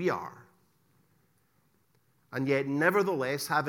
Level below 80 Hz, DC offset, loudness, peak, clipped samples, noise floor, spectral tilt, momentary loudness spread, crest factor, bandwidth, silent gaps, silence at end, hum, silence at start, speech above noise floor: -78 dBFS; under 0.1%; -29 LUFS; -10 dBFS; under 0.1%; -71 dBFS; -5.5 dB/octave; 13 LU; 22 dB; 17.5 kHz; none; 0 s; none; 0 s; 42 dB